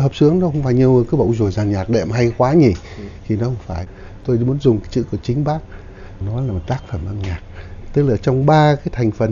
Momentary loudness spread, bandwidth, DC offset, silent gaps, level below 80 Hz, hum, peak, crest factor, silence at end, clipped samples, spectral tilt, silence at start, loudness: 16 LU; 7.2 kHz; under 0.1%; none; -34 dBFS; none; -2 dBFS; 16 dB; 0 s; under 0.1%; -8.5 dB/octave; 0 s; -17 LUFS